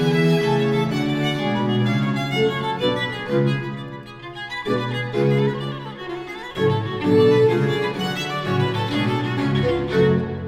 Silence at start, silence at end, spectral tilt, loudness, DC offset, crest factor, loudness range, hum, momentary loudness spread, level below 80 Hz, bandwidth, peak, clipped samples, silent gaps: 0 s; 0 s; -7 dB/octave; -21 LUFS; under 0.1%; 16 dB; 4 LU; none; 13 LU; -48 dBFS; 15 kHz; -6 dBFS; under 0.1%; none